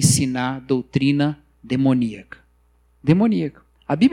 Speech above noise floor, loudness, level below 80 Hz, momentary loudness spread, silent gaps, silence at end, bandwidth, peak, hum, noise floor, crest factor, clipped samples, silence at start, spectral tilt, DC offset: 39 dB; -21 LUFS; -52 dBFS; 12 LU; none; 0 s; 16.5 kHz; -4 dBFS; none; -58 dBFS; 16 dB; under 0.1%; 0 s; -5.5 dB/octave; under 0.1%